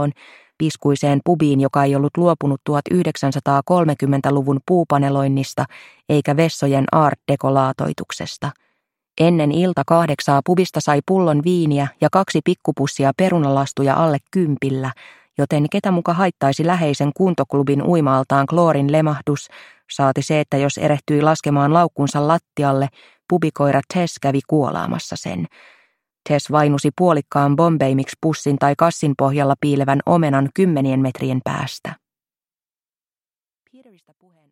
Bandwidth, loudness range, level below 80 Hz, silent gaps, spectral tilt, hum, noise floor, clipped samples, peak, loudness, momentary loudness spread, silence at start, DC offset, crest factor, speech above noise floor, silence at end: 14 kHz; 3 LU; -58 dBFS; none; -7 dB/octave; none; under -90 dBFS; under 0.1%; 0 dBFS; -18 LUFS; 8 LU; 0 s; under 0.1%; 18 dB; over 73 dB; 2.55 s